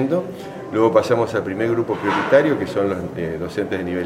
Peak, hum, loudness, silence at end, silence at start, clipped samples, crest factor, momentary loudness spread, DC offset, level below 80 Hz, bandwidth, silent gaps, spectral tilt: -2 dBFS; none; -20 LUFS; 0 s; 0 s; under 0.1%; 18 dB; 10 LU; under 0.1%; -52 dBFS; 15 kHz; none; -7 dB/octave